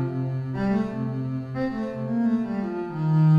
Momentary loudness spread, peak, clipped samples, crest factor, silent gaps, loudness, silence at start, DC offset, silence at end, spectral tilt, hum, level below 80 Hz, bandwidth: 6 LU; -12 dBFS; under 0.1%; 12 dB; none; -27 LUFS; 0 s; under 0.1%; 0 s; -10 dB/octave; none; -52 dBFS; 5.6 kHz